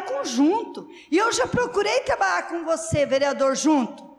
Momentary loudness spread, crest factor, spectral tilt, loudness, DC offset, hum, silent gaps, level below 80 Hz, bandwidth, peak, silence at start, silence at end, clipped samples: 6 LU; 10 dB; -4 dB/octave; -22 LUFS; under 0.1%; none; none; -52 dBFS; 13 kHz; -12 dBFS; 0 s; 0.05 s; under 0.1%